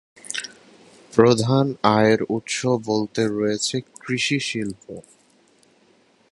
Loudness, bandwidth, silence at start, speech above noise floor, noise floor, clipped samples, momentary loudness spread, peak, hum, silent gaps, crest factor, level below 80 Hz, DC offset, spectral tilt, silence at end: -21 LUFS; 11.5 kHz; 0.25 s; 38 dB; -58 dBFS; under 0.1%; 14 LU; 0 dBFS; none; none; 22 dB; -58 dBFS; under 0.1%; -5 dB/octave; 1.3 s